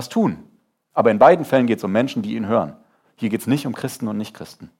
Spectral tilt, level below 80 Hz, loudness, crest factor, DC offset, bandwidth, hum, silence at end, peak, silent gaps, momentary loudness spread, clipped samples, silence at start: -6.5 dB/octave; -64 dBFS; -19 LUFS; 18 dB; under 0.1%; 16.5 kHz; none; 0.15 s; 0 dBFS; none; 16 LU; under 0.1%; 0 s